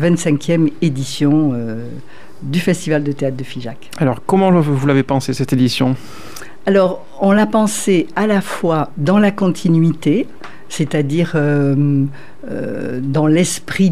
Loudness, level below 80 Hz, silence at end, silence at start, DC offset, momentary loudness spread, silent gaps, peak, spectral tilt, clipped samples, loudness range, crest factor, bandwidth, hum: -16 LUFS; -52 dBFS; 0 s; 0 s; 3%; 14 LU; none; -2 dBFS; -6.5 dB/octave; under 0.1%; 3 LU; 14 dB; 15 kHz; none